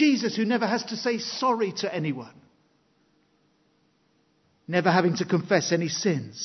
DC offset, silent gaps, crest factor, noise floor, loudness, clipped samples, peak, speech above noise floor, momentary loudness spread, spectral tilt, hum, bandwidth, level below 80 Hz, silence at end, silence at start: under 0.1%; none; 22 dB; -67 dBFS; -25 LUFS; under 0.1%; -6 dBFS; 41 dB; 7 LU; -5 dB/octave; none; 6.4 kHz; -74 dBFS; 0 s; 0 s